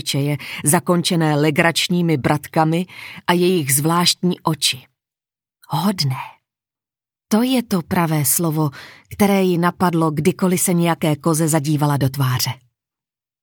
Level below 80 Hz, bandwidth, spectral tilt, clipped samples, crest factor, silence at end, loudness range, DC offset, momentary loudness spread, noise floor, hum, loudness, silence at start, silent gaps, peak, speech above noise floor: -58 dBFS; over 20 kHz; -4.5 dB/octave; under 0.1%; 18 dB; 0.85 s; 5 LU; under 0.1%; 7 LU; under -90 dBFS; none; -18 LUFS; 0.05 s; none; 0 dBFS; over 72 dB